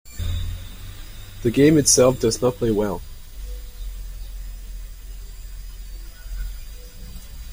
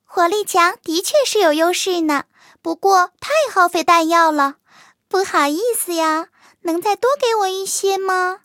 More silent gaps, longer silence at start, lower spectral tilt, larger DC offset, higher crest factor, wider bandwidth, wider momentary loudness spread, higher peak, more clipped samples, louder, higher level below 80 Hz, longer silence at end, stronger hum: neither; about the same, 0.05 s vs 0.1 s; first, -4.5 dB/octave vs -1 dB/octave; neither; about the same, 20 dB vs 16 dB; about the same, 16.5 kHz vs 17 kHz; first, 25 LU vs 7 LU; second, -4 dBFS vs 0 dBFS; neither; about the same, -19 LUFS vs -17 LUFS; first, -34 dBFS vs -70 dBFS; about the same, 0 s vs 0.05 s; neither